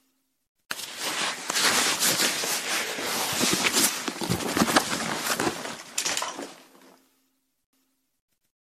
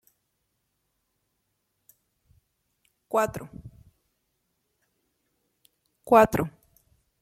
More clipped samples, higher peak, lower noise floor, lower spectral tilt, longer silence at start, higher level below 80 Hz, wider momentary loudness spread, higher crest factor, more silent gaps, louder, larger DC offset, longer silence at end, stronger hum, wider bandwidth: neither; about the same, -6 dBFS vs -4 dBFS; second, -72 dBFS vs -77 dBFS; second, -1.5 dB/octave vs -6 dB/octave; second, 0.7 s vs 3.15 s; second, -64 dBFS vs -56 dBFS; second, 13 LU vs 24 LU; about the same, 22 dB vs 26 dB; neither; about the same, -25 LUFS vs -23 LUFS; neither; first, 2.05 s vs 0.7 s; neither; about the same, 15.5 kHz vs 16.5 kHz